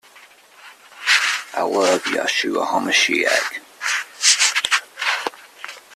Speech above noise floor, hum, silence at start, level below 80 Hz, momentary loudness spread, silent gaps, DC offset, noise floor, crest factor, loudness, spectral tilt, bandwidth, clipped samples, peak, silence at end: 28 dB; none; 0.6 s; -68 dBFS; 11 LU; none; under 0.1%; -48 dBFS; 20 dB; -18 LUFS; 0 dB/octave; 15.5 kHz; under 0.1%; 0 dBFS; 0 s